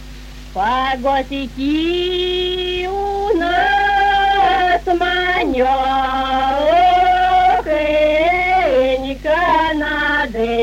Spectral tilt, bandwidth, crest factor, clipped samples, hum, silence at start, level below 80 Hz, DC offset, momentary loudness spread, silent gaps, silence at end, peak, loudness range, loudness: -4.5 dB/octave; 16 kHz; 12 dB; under 0.1%; none; 0 s; -34 dBFS; under 0.1%; 7 LU; none; 0 s; -4 dBFS; 3 LU; -15 LUFS